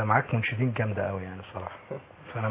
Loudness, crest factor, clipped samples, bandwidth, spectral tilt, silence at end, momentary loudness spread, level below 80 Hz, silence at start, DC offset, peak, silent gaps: -30 LUFS; 22 dB; under 0.1%; 3.9 kHz; -10.5 dB/octave; 0 s; 16 LU; -54 dBFS; 0 s; under 0.1%; -8 dBFS; none